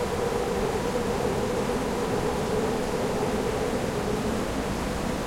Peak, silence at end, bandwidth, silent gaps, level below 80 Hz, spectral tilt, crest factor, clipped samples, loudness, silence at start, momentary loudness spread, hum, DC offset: -14 dBFS; 0 s; 16.5 kHz; none; -40 dBFS; -5.5 dB/octave; 14 dB; under 0.1%; -27 LUFS; 0 s; 2 LU; none; under 0.1%